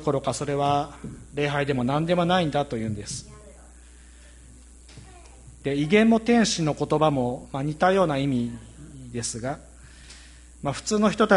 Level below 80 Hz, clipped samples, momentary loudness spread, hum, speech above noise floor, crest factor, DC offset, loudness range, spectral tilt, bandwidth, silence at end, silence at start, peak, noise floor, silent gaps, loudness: -48 dBFS; under 0.1%; 17 LU; none; 25 dB; 20 dB; under 0.1%; 7 LU; -5 dB/octave; 11.5 kHz; 0 s; 0 s; -6 dBFS; -48 dBFS; none; -24 LUFS